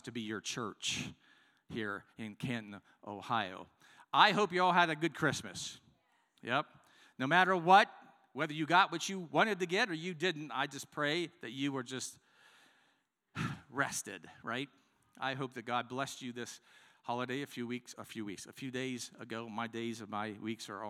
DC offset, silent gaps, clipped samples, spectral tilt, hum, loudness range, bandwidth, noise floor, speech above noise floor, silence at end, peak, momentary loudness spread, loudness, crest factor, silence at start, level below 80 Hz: under 0.1%; none; under 0.1%; -3.5 dB/octave; none; 11 LU; 16 kHz; -77 dBFS; 41 dB; 0 s; -10 dBFS; 17 LU; -35 LUFS; 26 dB; 0.05 s; -78 dBFS